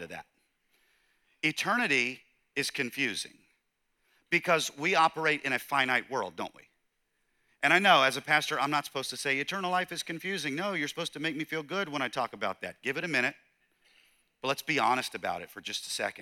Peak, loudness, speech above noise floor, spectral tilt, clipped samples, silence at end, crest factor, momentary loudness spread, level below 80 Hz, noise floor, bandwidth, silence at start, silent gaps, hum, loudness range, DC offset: -8 dBFS; -29 LUFS; 47 dB; -3 dB/octave; under 0.1%; 0 s; 24 dB; 11 LU; -76 dBFS; -77 dBFS; 18.5 kHz; 0 s; none; none; 6 LU; under 0.1%